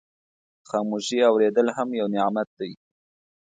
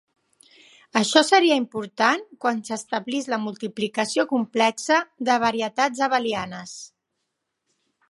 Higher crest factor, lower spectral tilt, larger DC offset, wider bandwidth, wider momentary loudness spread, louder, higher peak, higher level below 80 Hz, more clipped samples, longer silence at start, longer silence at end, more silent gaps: about the same, 18 dB vs 22 dB; first, -5 dB/octave vs -3 dB/octave; neither; second, 9.4 kHz vs 11.5 kHz; about the same, 12 LU vs 12 LU; about the same, -23 LUFS vs -22 LUFS; second, -8 dBFS vs -2 dBFS; about the same, -74 dBFS vs -70 dBFS; neither; second, 0.7 s vs 0.95 s; second, 0.65 s vs 1.25 s; first, 2.47-2.57 s vs none